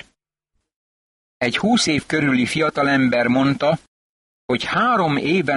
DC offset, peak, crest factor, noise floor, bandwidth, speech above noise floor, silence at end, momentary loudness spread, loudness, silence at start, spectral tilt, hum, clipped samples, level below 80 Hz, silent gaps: under 0.1%; -6 dBFS; 14 dB; -75 dBFS; 11.5 kHz; 56 dB; 0 s; 6 LU; -19 LUFS; 1.4 s; -5 dB/octave; none; under 0.1%; -54 dBFS; 3.88-4.49 s